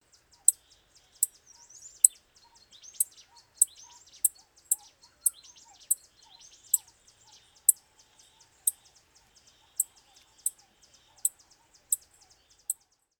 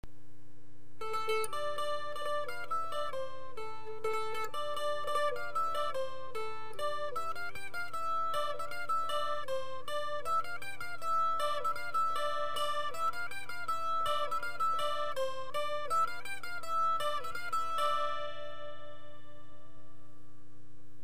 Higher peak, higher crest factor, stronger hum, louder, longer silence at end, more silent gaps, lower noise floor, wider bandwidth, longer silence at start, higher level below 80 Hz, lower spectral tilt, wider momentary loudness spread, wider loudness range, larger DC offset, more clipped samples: first, 0 dBFS vs -20 dBFS; first, 34 dB vs 16 dB; neither; first, -28 LUFS vs -36 LUFS; first, 0.45 s vs 0.05 s; neither; about the same, -63 dBFS vs -60 dBFS; first, over 20 kHz vs 15.5 kHz; first, 0.5 s vs 0 s; second, -76 dBFS vs -66 dBFS; second, 3 dB/octave vs -2.5 dB/octave; first, 14 LU vs 10 LU; first, 7 LU vs 4 LU; second, under 0.1% vs 2%; neither